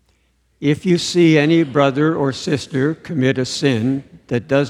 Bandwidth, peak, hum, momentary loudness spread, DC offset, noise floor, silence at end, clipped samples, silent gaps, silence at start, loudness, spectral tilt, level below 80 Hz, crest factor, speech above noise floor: 11 kHz; 0 dBFS; none; 9 LU; under 0.1%; -61 dBFS; 0 s; under 0.1%; none; 0.6 s; -17 LUFS; -6 dB/octave; -56 dBFS; 16 dB; 44 dB